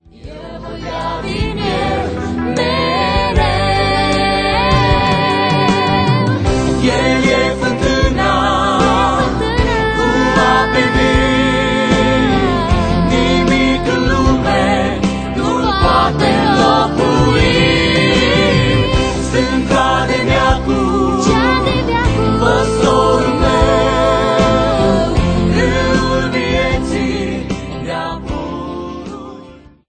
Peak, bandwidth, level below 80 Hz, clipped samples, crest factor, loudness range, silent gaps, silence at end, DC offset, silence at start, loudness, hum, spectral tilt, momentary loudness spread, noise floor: 0 dBFS; 9.4 kHz; -24 dBFS; under 0.1%; 14 dB; 4 LU; none; 0.2 s; under 0.1%; 0.2 s; -13 LUFS; none; -5.5 dB/octave; 9 LU; -38 dBFS